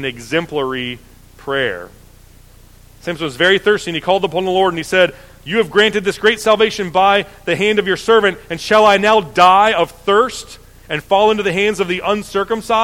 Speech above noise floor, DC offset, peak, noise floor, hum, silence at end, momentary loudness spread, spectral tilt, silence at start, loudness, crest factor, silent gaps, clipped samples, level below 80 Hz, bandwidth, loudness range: 28 dB; under 0.1%; 0 dBFS; -43 dBFS; none; 0 s; 13 LU; -4 dB/octave; 0 s; -15 LUFS; 16 dB; none; under 0.1%; -44 dBFS; 16 kHz; 6 LU